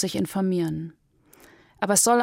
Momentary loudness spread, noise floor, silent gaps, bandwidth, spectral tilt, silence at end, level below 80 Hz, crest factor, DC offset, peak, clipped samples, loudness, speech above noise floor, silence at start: 15 LU; -55 dBFS; none; 16.5 kHz; -4 dB/octave; 0 s; -62 dBFS; 18 dB; under 0.1%; -6 dBFS; under 0.1%; -24 LUFS; 32 dB; 0 s